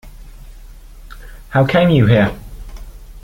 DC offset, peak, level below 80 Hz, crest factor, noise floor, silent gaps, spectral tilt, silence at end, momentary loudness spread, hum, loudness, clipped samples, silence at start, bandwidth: under 0.1%; -2 dBFS; -34 dBFS; 16 dB; -36 dBFS; none; -8 dB/octave; 0.05 s; 25 LU; none; -14 LUFS; under 0.1%; 0.05 s; 16.5 kHz